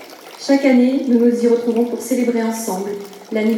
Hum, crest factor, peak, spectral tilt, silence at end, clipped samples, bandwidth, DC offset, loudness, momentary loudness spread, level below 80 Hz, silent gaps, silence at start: none; 16 dB; -2 dBFS; -5 dB/octave; 0 s; under 0.1%; 16 kHz; under 0.1%; -17 LUFS; 13 LU; -78 dBFS; none; 0 s